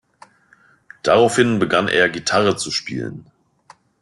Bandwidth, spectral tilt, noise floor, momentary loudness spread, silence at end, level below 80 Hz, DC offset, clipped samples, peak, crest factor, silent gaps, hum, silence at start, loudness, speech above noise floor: 12 kHz; -4 dB/octave; -55 dBFS; 12 LU; 0.8 s; -56 dBFS; under 0.1%; under 0.1%; -2 dBFS; 18 dB; none; none; 1.05 s; -17 LUFS; 37 dB